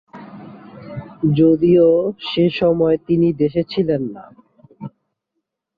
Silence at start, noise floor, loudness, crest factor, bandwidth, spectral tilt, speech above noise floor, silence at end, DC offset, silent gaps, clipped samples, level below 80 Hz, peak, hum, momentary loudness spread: 0.15 s; -77 dBFS; -16 LUFS; 14 dB; 5 kHz; -10 dB/octave; 61 dB; 0.9 s; under 0.1%; none; under 0.1%; -50 dBFS; -4 dBFS; none; 25 LU